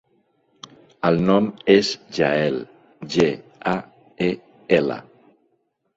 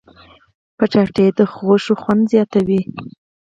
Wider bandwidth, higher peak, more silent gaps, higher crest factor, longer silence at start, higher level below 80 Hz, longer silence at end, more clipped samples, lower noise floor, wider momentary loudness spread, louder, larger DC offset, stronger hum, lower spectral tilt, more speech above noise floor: about the same, 8 kHz vs 7.8 kHz; about the same, -2 dBFS vs 0 dBFS; neither; about the same, 20 dB vs 16 dB; first, 1.05 s vs 0.8 s; about the same, -58 dBFS vs -54 dBFS; first, 0.95 s vs 0.35 s; neither; first, -69 dBFS vs -47 dBFS; first, 13 LU vs 6 LU; second, -21 LUFS vs -16 LUFS; neither; neither; second, -6 dB/octave vs -8 dB/octave; first, 50 dB vs 31 dB